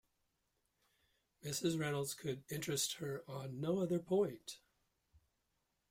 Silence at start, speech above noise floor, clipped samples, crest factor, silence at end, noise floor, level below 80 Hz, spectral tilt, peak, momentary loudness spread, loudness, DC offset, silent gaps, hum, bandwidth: 1.45 s; 45 dB; under 0.1%; 18 dB; 1.35 s; -84 dBFS; -76 dBFS; -4.5 dB/octave; -24 dBFS; 13 LU; -40 LUFS; under 0.1%; none; none; 16 kHz